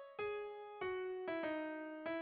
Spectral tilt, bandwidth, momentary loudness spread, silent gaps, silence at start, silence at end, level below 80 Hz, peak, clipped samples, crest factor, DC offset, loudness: -2.5 dB/octave; 4.9 kHz; 5 LU; none; 0 s; 0 s; -78 dBFS; -32 dBFS; under 0.1%; 12 dB; under 0.1%; -44 LUFS